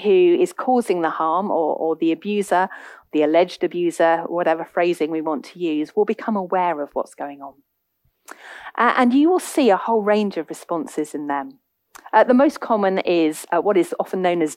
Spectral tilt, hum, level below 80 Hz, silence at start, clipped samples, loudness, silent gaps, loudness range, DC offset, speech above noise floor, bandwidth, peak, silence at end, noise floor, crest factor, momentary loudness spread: -5.5 dB/octave; none; -70 dBFS; 0 s; under 0.1%; -20 LUFS; none; 4 LU; under 0.1%; 49 dB; 15.5 kHz; -2 dBFS; 0 s; -68 dBFS; 16 dB; 12 LU